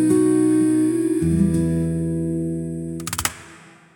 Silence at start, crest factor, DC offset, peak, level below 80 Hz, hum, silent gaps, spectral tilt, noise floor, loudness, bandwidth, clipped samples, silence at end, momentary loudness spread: 0 s; 18 dB; under 0.1%; -2 dBFS; -42 dBFS; none; none; -6.5 dB/octave; -46 dBFS; -21 LUFS; 19 kHz; under 0.1%; 0.4 s; 10 LU